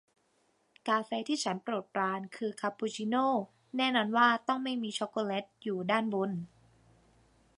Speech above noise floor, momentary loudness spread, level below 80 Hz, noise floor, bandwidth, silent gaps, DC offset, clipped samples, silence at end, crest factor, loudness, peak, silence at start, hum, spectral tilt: 41 dB; 10 LU; -78 dBFS; -73 dBFS; 11 kHz; none; under 0.1%; under 0.1%; 1.1 s; 22 dB; -32 LUFS; -12 dBFS; 0.85 s; none; -4.5 dB/octave